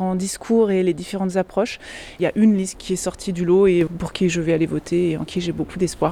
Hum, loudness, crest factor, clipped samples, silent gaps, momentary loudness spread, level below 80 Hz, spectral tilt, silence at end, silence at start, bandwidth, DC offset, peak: none; -21 LUFS; 14 dB; under 0.1%; none; 8 LU; -46 dBFS; -6 dB/octave; 0 s; 0 s; 13.5 kHz; under 0.1%; -6 dBFS